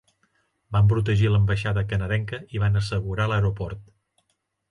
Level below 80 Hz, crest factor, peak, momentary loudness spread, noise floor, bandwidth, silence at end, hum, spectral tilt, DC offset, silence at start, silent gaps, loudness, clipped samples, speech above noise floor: -40 dBFS; 12 dB; -12 dBFS; 10 LU; -74 dBFS; 10.5 kHz; 0.9 s; none; -7.5 dB/octave; under 0.1%; 0.7 s; none; -24 LUFS; under 0.1%; 52 dB